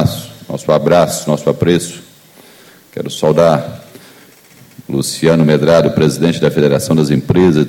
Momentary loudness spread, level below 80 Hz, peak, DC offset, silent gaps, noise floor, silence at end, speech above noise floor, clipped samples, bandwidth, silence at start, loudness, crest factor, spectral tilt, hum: 15 LU; -44 dBFS; 0 dBFS; under 0.1%; none; -42 dBFS; 0 s; 31 dB; under 0.1%; 17 kHz; 0 s; -12 LUFS; 14 dB; -6 dB/octave; none